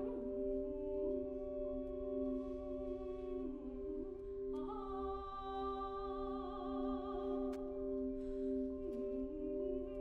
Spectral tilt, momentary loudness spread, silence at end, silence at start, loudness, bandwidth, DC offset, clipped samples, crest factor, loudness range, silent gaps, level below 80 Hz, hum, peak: -8.5 dB/octave; 4 LU; 0 s; 0 s; -43 LUFS; 4.6 kHz; under 0.1%; under 0.1%; 12 dB; 2 LU; none; -54 dBFS; none; -30 dBFS